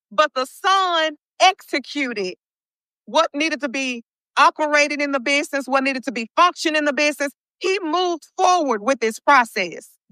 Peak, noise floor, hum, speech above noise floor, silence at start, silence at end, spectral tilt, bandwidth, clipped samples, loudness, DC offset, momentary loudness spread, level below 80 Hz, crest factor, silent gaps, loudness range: -2 dBFS; under -90 dBFS; none; over 70 dB; 0.1 s; 0.25 s; -1.5 dB/octave; 15.5 kHz; under 0.1%; -19 LUFS; under 0.1%; 10 LU; -82 dBFS; 20 dB; 1.27-1.32 s, 2.56-2.60 s, 2.70-2.79 s, 2.85-2.91 s, 4.16-4.21 s, 7.51-7.55 s; 3 LU